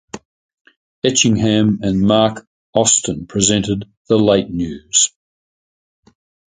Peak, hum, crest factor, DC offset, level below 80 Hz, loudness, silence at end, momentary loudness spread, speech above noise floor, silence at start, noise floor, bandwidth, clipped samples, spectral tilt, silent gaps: 0 dBFS; none; 18 dB; under 0.1%; -44 dBFS; -15 LUFS; 1.4 s; 10 LU; over 75 dB; 0.15 s; under -90 dBFS; 9.6 kHz; under 0.1%; -3.5 dB/octave; 0.25-0.65 s, 0.76-1.02 s, 2.47-2.73 s, 3.97-4.05 s